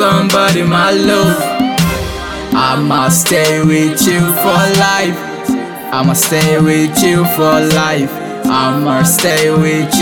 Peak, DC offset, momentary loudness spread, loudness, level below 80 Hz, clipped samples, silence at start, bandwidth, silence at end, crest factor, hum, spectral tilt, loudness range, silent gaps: 0 dBFS; 0.1%; 8 LU; -11 LUFS; -38 dBFS; under 0.1%; 0 s; 19.5 kHz; 0 s; 12 dB; none; -4.5 dB/octave; 1 LU; none